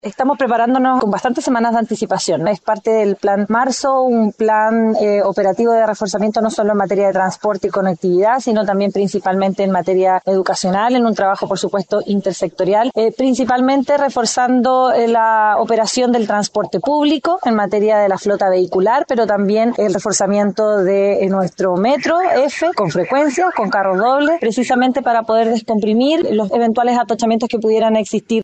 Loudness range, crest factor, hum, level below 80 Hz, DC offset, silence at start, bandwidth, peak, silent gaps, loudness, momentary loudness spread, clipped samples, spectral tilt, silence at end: 2 LU; 10 dB; none; -58 dBFS; under 0.1%; 0.05 s; 9 kHz; -4 dBFS; none; -15 LUFS; 4 LU; under 0.1%; -5 dB/octave; 0 s